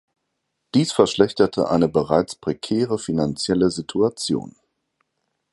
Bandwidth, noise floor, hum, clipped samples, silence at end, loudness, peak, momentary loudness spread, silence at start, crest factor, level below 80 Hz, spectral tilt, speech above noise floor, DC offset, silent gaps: 11.5 kHz; -76 dBFS; none; under 0.1%; 1 s; -21 LUFS; 0 dBFS; 7 LU; 0.75 s; 20 dB; -52 dBFS; -5.5 dB/octave; 56 dB; under 0.1%; none